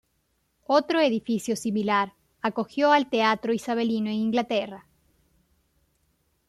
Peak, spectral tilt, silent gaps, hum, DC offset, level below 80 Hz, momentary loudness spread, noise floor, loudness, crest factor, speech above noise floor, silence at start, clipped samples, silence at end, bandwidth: -8 dBFS; -5 dB/octave; none; none; under 0.1%; -68 dBFS; 9 LU; -72 dBFS; -25 LUFS; 18 dB; 48 dB; 0.7 s; under 0.1%; 1.7 s; 13.5 kHz